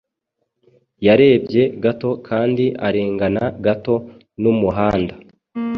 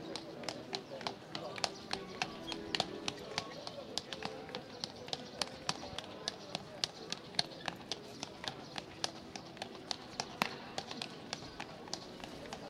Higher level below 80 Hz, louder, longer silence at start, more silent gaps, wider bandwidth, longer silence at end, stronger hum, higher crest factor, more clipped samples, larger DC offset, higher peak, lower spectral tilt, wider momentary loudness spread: first, -46 dBFS vs -70 dBFS; first, -18 LUFS vs -42 LUFS; first, 1 s vs 0 s; neither; second, 5.8 kHz vs 16 kHz; about the same, 0 s vs 0 s; neither; second, 16 dB vs 34 dB; neither; neither; first, -2 dBFS vs -10 dBFS; first, -9 dB/octave vs -2.5 dB/octave; about the same, 10 LU vs 9 LU